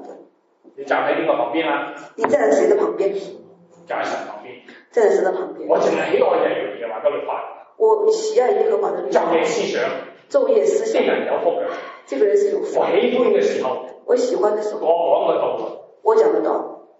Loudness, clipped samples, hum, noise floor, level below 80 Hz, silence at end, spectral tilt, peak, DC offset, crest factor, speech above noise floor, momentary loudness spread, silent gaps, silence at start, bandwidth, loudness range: -19 LUFS; under 0.1%; none; -52 dBFS; -82 dBFS; 0.15 s; -4 dB/octave; -2 dBFS; under 0.1%; 18 dB; 34 dB; 12 LU; none; 0 s; 8 kHz; 2 LU